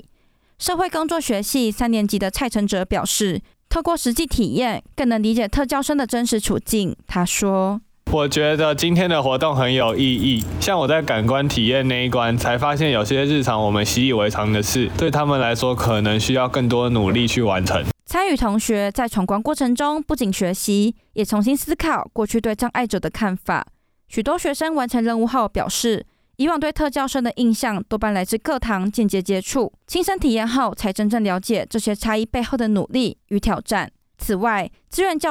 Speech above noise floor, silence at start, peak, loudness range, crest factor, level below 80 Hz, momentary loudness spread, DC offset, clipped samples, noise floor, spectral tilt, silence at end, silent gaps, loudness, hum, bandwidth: 38 dB; 0.6 s; -8 dBFS; 3 LU; 10 dB; -38 dBFS; 5 LU; under 0.1%; under 0.1%; -58 dBFS; -4.5 dB/octave; 0 s; none; -20 LUFS; none; 19 kHz